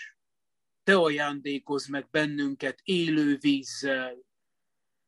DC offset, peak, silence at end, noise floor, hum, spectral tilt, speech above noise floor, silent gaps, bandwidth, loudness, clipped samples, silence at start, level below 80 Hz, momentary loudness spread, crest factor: under 0.1%; -8 dBFS; 0.85 s; -89 dBFS; none; -5 dB/octave; 62 dB; none; 11.5 kHz; -27 LUFS; under 0.1%; 0 s; -74 dBFS; 10 LU; 22 dB